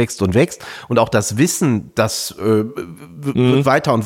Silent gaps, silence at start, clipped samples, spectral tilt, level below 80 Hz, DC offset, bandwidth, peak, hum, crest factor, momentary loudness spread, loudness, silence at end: none; 0 s; under 0.1%; -5.5 dB/octave; -48 dBFS; under 0.1%; 17 kHz; -2 dBFS; none; 16 dB; 12 LU; -17 LUFS; 0 s